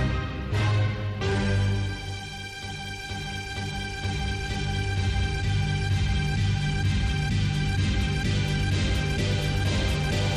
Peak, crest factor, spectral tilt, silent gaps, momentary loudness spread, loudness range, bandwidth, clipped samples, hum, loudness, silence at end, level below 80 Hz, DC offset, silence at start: -16 dBFS; 10 dB; -5.5 dB/octave; none; 8 LU; 5 LU; 12.5 kHz; under 0.1%; 50 Hz at -40 dBFS; -27 LUFS; 0 s; -32 dBFS; under 0.1%; 0 s